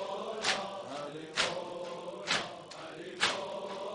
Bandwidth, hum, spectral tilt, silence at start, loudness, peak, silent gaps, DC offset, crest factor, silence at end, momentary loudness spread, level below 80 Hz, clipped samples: 10.5 kHz; none; -1.5 dB/octave; 0 s; -35 LUFS; -14 dBFS; none; under 0.1%; 24 dB; 0 s; 12 LU; -72 dBFS; under 0.1%